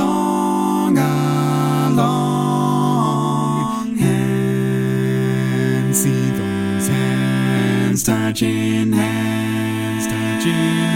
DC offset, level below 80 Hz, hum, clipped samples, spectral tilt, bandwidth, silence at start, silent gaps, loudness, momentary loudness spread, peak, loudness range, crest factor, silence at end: under 0.1%; -50 dBFS; none; under 0.1%; -5.5 dB/octave; 17 kHz; 0 s; none; -18 LUFS; 4 LU; -2 dBFS; 1 LU; 14 dB; 0 s